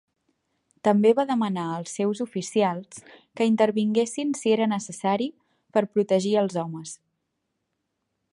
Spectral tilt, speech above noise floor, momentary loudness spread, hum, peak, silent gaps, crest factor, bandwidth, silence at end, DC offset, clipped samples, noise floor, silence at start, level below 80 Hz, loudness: -5.5 dB/octave; 55 dB; 13 LU; none; -6 dBFS; none; 18 dB; 11.5 kHz; 1.4 s; under 0.1%; under 0.1%; -79 dBFS; 0.85 s; -74 dBFS; -24 LUFS